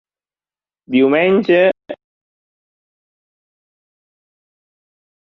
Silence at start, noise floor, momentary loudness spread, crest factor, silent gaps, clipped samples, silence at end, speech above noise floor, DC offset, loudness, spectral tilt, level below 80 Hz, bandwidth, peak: 0.9 s; under -90 dBFS; 19 LU; 18 dB; none; under 0.1%; 3.35 s; over 77 dB; under 0.1%; -14 LUFS; -8 dB/octave; -68 dBFS; 5.8 kHz; -2 dBFS